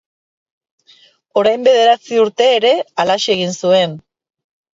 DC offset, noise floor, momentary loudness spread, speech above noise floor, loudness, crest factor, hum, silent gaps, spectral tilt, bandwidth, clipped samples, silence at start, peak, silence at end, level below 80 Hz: under 0.1%; -50 dBFS; 5 LU; 37 dB; -14 LUFS; 16 dB; none; none; -3.5 dB/octave; 7.8 kHz; under 0.1%; 1.35 s; 0 dBFS; 0.75 s; -64 dBFS